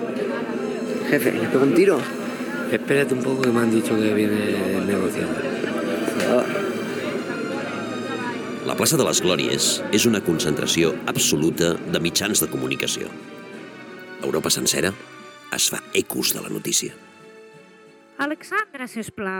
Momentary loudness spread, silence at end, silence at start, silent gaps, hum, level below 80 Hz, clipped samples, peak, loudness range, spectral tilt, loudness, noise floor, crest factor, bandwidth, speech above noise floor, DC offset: 10 LU; 0 s; 0 s; none; none; -58 dBFS; under 0.1%; -6 dBFS; 5 LU; -3.5 dB/octave; -22 LUFS; -49 dBFS; 18 dB; 19 kHz; 27 dB; under 0.1%